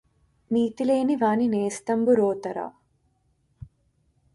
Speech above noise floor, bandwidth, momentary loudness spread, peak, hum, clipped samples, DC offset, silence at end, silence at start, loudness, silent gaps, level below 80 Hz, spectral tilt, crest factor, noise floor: 45 dB; 11.5 kHz; 11 LU; -10 dBFS; none; under 0.1%; under 0.1%; 0.7 s; 0.5 s; -24 LUFS; none; -62 dBFS; -6 dB/octave; 16 dB; -68 dBFS